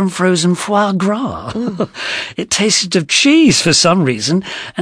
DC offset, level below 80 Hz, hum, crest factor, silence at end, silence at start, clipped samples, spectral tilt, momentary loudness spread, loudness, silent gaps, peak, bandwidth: under 0.1%; -48 dBFS; none; 14 dB; 0 s; 0 s; under 0.1%; -3.5 dB/octave; 11 LU; -13 LUFS; none; 0 dBFS; 11 kHz